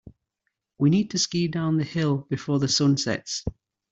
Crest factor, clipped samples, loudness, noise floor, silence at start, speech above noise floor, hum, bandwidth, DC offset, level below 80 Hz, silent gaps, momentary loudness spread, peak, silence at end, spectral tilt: 16 dB; under 0.1%; -24 LUFS; -80 dBFS; 0.05 s; 56 dB; none; 8.2 kHz; under 0.1%; -52 dBFS; none; 8 LU; -10 dBFS; 0.4 s; -5 dB/octave